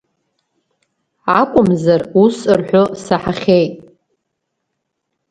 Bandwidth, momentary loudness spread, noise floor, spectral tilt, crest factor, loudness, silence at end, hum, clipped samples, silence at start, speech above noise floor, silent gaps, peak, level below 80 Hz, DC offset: 9.6 kHz; 6 LU; -74 dBFS; -7 dB/octave; 16 dB; -14 LUFS; 1.5 s; none; under 0.1%; 1.25 s; 61 dB; none; 0 dBFS; -50 dBFS; under 0.1%